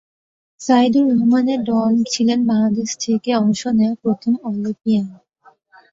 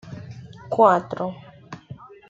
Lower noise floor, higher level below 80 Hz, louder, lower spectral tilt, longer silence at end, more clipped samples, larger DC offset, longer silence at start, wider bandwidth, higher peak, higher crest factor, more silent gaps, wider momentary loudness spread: first, -53 dBFS vs -43 dBFS; about the same, -60 dBFS vs -62 dBFS; first, -17 LUFS vs -21 LUFS; second, -5.5 dB/octave vs -7.5 dB/octave; first, 0.8 s vs 0.35 s; neither; neither; first, 0.6 s vs 0.05 s; about the same, 7.8 kHz vs 7.8 kHz; about the same, -2 dBFS vs -2 dBFS; second, 14 dB vs 22 dB; neither; second, 7 LU vs 25 LU